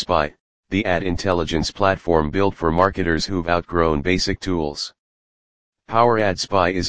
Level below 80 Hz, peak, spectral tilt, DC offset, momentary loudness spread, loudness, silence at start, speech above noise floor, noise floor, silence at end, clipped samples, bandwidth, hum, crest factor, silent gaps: -38 dBFS; 0 dBFS; -5 dB/octave; 2%; 6 LU; -20 LUFS; 0 s; over 70 dB; under -90 dBFS; 0 s; under 0.1%; 9.8 kHz; none; 20 dB; 0.40-0.63 s, 4.99-5.73 s